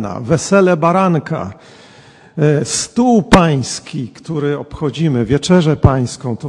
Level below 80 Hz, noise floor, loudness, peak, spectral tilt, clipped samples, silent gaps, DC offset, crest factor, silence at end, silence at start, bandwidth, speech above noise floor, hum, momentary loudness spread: -34 dBFS; -42 dBFS; -14 LUFS; 0 dBFS; -6 dB/octave; under 0.1%; none; under 0.1%; 14 dB; 0 s; 0 s; 11.5 kHz; 29 dB; none; 12 LU